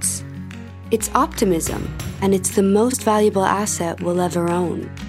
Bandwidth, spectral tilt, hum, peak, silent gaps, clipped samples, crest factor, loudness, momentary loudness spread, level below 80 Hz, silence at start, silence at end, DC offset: 16 kHz; -5 dB/octave; none; 0 dBFS; none; under 0.1%; 20 dB; -19 LUFS; 11 LU; -40 dBFS; 0 s; 0 s; under 0.1%